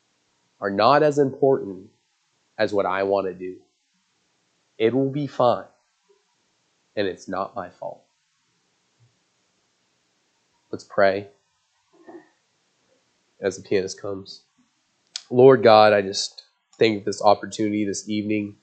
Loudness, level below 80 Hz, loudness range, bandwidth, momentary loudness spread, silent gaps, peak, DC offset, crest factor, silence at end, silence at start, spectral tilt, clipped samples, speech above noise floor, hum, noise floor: -21 LUFS; -76 dBFS; 15 LU; 9 kHz; 21 LU; none; 0 dBFS; under 0.1%; 24 dB; 0.1 s; 0.6 s; -5 dB/octave; under 0.1%; 49 dB; none; -69 dBFS